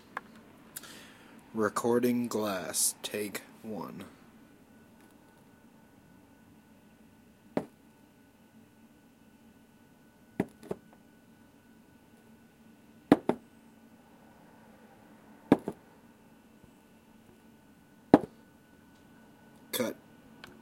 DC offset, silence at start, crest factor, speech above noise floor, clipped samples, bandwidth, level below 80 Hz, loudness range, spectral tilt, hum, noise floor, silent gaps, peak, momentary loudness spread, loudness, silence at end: under 0.1%; 0.15 s; 36 dB; 28 dB; under 0.1%; 16.5 kHz; -70 dBFS; 15 LU; -4.5 dB/octave; none; -60 dBFS; none; -2 dBFS; 29 LU; -32 LUFS; 0.7 s